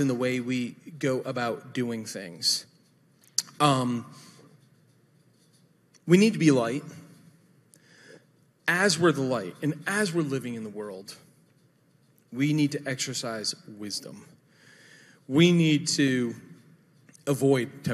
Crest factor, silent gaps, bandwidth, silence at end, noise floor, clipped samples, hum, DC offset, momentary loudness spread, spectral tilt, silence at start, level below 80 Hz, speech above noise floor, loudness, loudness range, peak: 24 dB; none; 14.5 kHz; 0 s; -63 dBFS; under 0.1%; none; under 0.1%; 16 LU; -4.5 dB/octave; 0 s; -74 dBFS; 37 dB; -26 LUFS; 5 LU; -4 dBFS